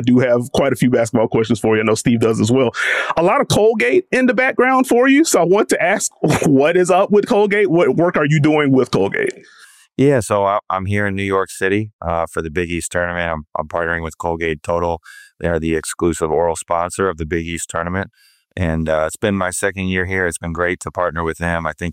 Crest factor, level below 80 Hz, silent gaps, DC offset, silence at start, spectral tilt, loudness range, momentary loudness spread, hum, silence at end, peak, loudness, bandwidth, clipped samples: 12 dB; -40 dBFS; 11.93-11.99 s; under 0.1%; 0 s; -5.5 dB/octave; 7 LU; 9 LU; none; 0 s; -4 dBFS; -17 LUFS; 16 kHz; under 0.1%